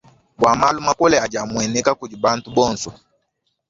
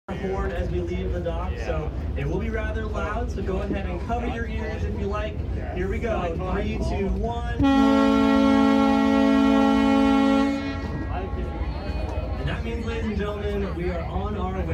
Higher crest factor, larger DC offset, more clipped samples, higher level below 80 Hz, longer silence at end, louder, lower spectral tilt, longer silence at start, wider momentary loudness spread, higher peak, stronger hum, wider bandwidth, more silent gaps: about the same, 18 dB vs 16 dB; neither; neither; second, -50 dBFS vs -32 dBFS; first, 0.75 s vs 0 s; first, -18 LUFS vs -24 LUFS; second, -3.5 dB/octave vs -7.5 dB/octave; first, 0.4 s vs 0.1 s; second, 7 LU vs 11 LU; first, -2 dBFS vs -8 dBFS; neither; second, 7.8 kHz vs 9 kHz; neither